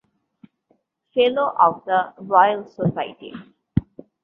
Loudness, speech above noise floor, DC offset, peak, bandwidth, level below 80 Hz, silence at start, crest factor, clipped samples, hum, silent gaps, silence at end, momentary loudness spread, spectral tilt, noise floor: -20 LUFS; 46 dB; under 0.1%; -2 dBFS; 5.4 kHz; -48 dBFS; 1.15 s; 20 dB; under 0.1%; none; none; 0.4 s; 15 LU; -9 dB/octave; -66 dBFS